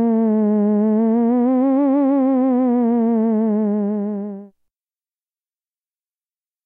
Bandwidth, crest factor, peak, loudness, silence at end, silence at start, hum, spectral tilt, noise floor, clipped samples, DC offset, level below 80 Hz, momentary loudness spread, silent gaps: 2.9 kHz; 10 dB; -8 dBFS; -17 LUFS; 2.2 s; 0 s; none; -12.5 dB/octave; under -90 dBFS; under 0.1%; under 0.1%; -80 dBFS; 7 LU; none